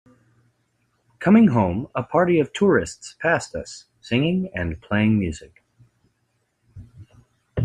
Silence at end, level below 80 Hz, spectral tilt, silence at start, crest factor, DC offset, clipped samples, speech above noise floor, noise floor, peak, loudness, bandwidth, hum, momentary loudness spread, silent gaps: 0 s; -50 dBFS; -6.5 dB/octave; 1.2 s; 18 dB; under 0.1%; under 0.1%; 50 dB; -70 dBFS; -4 dBFS; -21 LUFS; 9.8 kHz; none; 17 LU; none